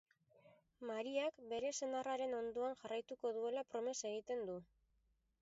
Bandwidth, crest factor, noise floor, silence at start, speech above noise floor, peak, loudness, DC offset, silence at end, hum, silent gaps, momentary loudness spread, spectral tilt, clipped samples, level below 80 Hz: 7.6 kHz; 16 dB; -81 dBFS; 0.45 s; 38 dB; -28 dBFS; -44 LUFS; under 0.1%; 0.8 s; none; none; 5 LU; -2.5 dB/octave; under 0.1%; -82 dBFS